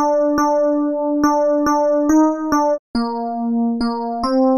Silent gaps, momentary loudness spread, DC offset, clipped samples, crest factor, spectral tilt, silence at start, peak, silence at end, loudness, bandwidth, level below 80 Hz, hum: 2.79-2.94 s; 7 LU; under 0.1%; under 0.1%; 12 dB; -5 dB/octave; 0 s; -4 dBFS; 0 s; -17 LUFS; 13 kHz; -46 dBFS; none